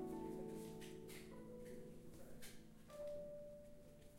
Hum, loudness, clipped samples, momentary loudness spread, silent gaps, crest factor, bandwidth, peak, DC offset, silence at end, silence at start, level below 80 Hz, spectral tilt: none; -55 LUFS; under 0.1%; 10 LU; none; 14 dB; 16 kHz; -38 dBFS; under 0.1%; 0 s; 0 s; -68 dBFS; -5.5 dB/octave